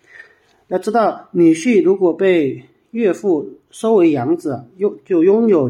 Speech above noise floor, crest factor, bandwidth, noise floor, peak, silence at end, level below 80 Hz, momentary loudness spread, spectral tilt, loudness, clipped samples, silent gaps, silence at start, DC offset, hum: 32 dB; 12 dB; 11.5 kHz; -47 dBFS; -2 dBFS; 0 s; -70 dBFS; 10 LU; -7 dB/octave; -16 LUFS; under 0.1%; none; 0.7 s; under 0.1%; none